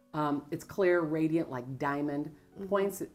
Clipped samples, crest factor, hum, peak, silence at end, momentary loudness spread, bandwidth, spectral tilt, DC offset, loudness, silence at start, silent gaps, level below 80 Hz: under 0.1%; 16 dB; none; -16 dBFS; 0.05 s; 11 LU; 16 kHz; -6.5 dB/octave; under 0.1%; -32 LUFS; 0.15 s; none; -68 dBFS